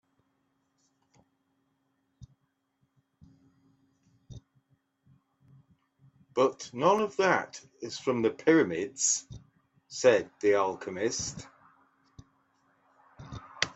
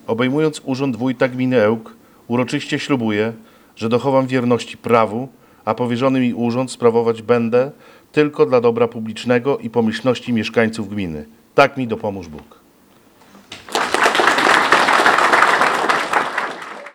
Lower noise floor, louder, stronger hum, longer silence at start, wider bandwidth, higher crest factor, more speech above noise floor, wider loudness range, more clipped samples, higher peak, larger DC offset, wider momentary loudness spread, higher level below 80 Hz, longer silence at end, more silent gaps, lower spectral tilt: first, -76 dBFS vs -51 dBFS; second, -28 LUFS vs -17 LUFS; neither; first, 2.2 s vs 0.1 s; second, 8.4 kHz vs 17 kHz; first, 28 dB vs 18 dB; first, 49 dB vs 33 dB; about the same, 7 LU vs 6 LU; neither; second, -6 dBFS vs 0 dBFS; neither; first, 20 LU vs 13 LU; second, -66 dBFS vs -56 dBFS; about the same, 0.05 s vs 0.05 s; neither; second, -3.5 dB/octave vs -5 dB/octave